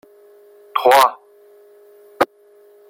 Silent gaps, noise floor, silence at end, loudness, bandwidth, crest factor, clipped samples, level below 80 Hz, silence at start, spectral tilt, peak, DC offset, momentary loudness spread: none; -50 dBFS; 0.65 s; -16 LUFS; 16.5 kHz; 20 dB; under 0.1%; -64 dBFS; 0.75 s; -2 dB/octave; 0 dBFS; under 0.1%; 10 LU